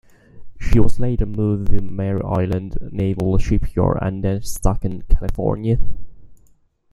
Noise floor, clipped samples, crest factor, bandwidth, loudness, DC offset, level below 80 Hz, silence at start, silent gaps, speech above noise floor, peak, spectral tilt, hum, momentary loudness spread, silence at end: -55 dBFS; under 0.1%; 14 dB; 12.5 kHz; -22 LUFS; under 0.1%; -24 dBFS; 0.35 s; none; 40 dB; -2 dBFS; -8 dB/octave; none; 7 LU; 0.55 s